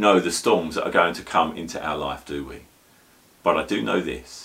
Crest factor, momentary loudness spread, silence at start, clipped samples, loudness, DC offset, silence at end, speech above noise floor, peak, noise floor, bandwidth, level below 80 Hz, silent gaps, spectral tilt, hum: 22 dB; 12 LU; 0 s; under 0.1%; -23 LUFS; under 0.1%; 0 s; 33 dB; -2 dBFS; -56 dBFS; 16 kHz; -52 dBFS; none; -4 dB/octave; none